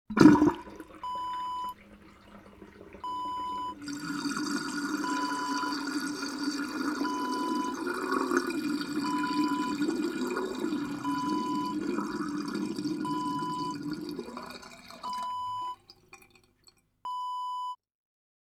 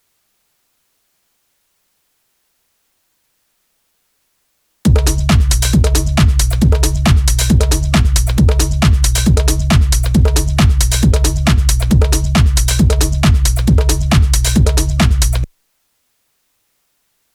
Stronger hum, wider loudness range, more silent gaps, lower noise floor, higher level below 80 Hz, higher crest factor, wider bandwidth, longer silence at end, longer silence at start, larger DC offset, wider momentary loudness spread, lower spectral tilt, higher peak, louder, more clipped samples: neither; first, 8 LU vs 4 LU; neither; about the same, -64 dBFS vs -64 dBFS; second, -64 dBFS vs -16 dBFS; first, 28 dB vs 12 dB; second, 15.5 kHz vs 17.5 kHz; second, 0.85 s vs 1.9 s; second, 0.1 s vs 4.85 s; neither; first, 12 LU vs 1 LU; about the same, -5 dB/octave vs -5 dB/octave; about the same, -4 dBFS vs -2 dBFS; second, -31 LUFS vs -13 LUFS; neither